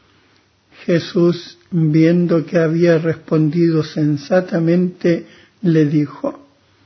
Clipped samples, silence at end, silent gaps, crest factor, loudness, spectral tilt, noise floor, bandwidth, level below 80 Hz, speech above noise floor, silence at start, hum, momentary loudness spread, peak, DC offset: under 0.1%; 0.5 s; none; 14 dB; -16 LUFS; -8.5 dB/octave; -56 dBFS; 6.4 kHz; -60 dBFS; 40 dB; 0.8 s; none; 9 LU; -2 dBFS; under 0.1%